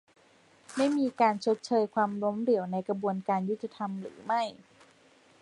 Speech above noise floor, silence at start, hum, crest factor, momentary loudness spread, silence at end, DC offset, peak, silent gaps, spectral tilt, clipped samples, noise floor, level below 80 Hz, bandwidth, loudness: 32 dB; 0.7 s; none; 18 dB; 10 LU; 0.9 s; under 0.1%; -12 dBFS; none; -6 dB/octave; under 0.1%; -62 dBFS; -78 dBFS; 11.5 kHz; -30 LUFS